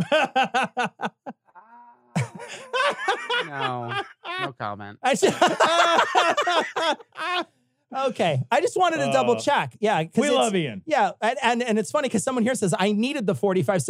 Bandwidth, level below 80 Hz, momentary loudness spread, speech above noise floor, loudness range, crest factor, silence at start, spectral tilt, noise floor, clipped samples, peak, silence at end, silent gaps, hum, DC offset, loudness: 15.5 kHz; -74 dBFS; 11 LU; 30 dB; 6 LU; 20 dB; 0 s; -4 dB/octave; -53 dBFS; under 0.1%; -4 dBFS; 0 s; none; none; under 0.1%; -23 LUFS